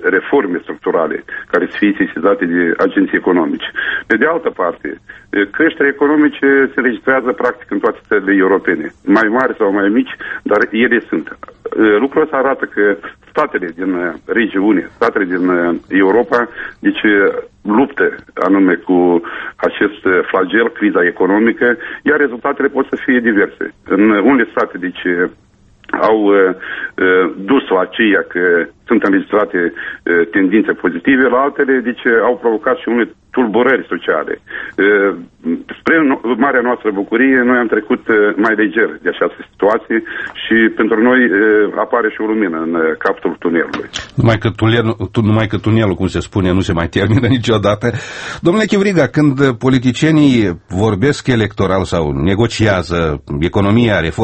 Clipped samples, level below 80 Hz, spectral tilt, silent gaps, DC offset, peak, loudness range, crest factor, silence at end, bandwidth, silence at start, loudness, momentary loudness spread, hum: under 0.1%; -42 dBFS; -7 dB/octave; none; under 0.1%; 0 dBFS; 2 LU; 14 dB; 0 s; 8.6 kHz; 0 s; -14 LUFS; 7 LU; none